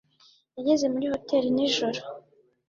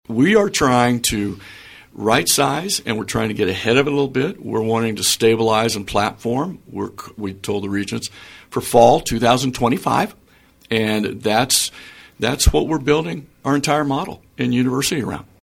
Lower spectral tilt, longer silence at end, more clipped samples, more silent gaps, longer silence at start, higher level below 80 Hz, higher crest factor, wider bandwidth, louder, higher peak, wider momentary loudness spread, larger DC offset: about the same, -4 dB/octave vs -4 dB/octave; first, 0.5 s vs 0.25 s; neither; neither; first, 0.55 s vs 0.1 s; second, -66 dBFS vs -34 dBFS; about the same, 16 dB vs 18 dB; second, 7.8 kHz vs 17 kHz; second, -26 LUFS vs -18 LUFS; second, -12 dBFS vs 0 dBFS; first, 19 LU vs 13 LU; neither